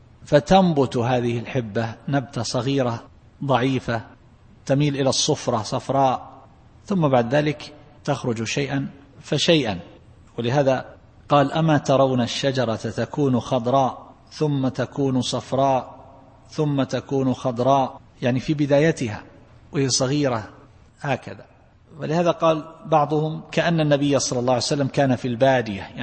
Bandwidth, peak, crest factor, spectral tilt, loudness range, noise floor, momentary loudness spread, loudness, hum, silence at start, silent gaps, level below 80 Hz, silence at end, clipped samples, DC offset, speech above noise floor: 8.8 kHz; -2 dBFS; 20 dB; -5.5 dB/octave; 3 LU; -50 dBFS; 11 LU; -22 LUFS; none; 0.2 s; none; -52 dBFS; 0 s; under 0.1%; under 0.1%; 29 dB